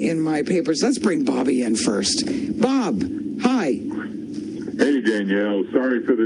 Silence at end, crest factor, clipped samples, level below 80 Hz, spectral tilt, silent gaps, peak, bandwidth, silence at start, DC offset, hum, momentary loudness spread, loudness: 0 s; 18 dB; under 0.1%; -56 dBFS; -4.5 dB/octave; none; -2 dBFS; 10.5 kHz; 0 s; under 0.1%; none; 9 LU; -21 LUFS